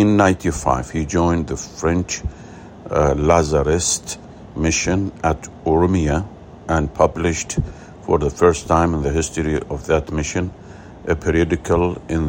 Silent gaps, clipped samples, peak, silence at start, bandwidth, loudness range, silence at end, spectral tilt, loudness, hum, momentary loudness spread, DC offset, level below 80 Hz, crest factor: none; under 0.1%; 0 dBFS; 0 s; 16.5 kHz; 2 LU; 0 s; -5.5 dB/octave; -19 LUFS; none; 15 LU; under 0.1%; -34 dBFS; 18 dB